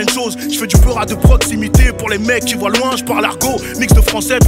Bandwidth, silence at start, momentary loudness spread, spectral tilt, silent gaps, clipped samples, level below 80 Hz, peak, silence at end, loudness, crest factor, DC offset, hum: 16.5 kHz; 0 s; 6 LU; -4.5 dB/octave; none; under 0.1%; -16 dBFS; 0 dBFS; 0 s; -13 LUFS; 12 dB; under 0.1%; none